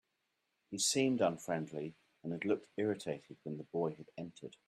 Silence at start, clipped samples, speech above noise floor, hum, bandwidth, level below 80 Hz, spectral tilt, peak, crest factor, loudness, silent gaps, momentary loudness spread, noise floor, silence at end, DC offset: 0.7 s; under 0.1%; 46 dB; none; 14 kHz; -80 dBFS; -4 dB/octave; -20 dBFS; 18 dB; -37 LUFS; none; 16 LU; -84 dBFS; 0.2 s; under 0.1%